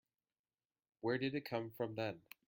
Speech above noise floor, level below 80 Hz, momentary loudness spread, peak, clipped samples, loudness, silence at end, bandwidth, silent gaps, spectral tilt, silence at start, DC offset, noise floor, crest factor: over 49 dB; -82 dBFS; 6 LU; -26 dBFS; under 0.1%; -42 LUFS; 0.3 s; 16.5 kHz; none; -7 dB/octave; 1.05 s; under 0.1%; under -90 dBFS; 18 dB